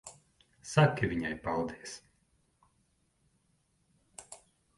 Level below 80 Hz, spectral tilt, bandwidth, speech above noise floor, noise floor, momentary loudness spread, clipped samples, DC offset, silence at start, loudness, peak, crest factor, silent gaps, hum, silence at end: -60 dBFS; -6 dB/octave; 11.5 kHz; 43 dB; -74 dBFS; 25 LU; under 0.1%; under 0.1%; 0.05 s; -31 LUFS; -10 dBFS; 26 dB; none; none; 0.4 s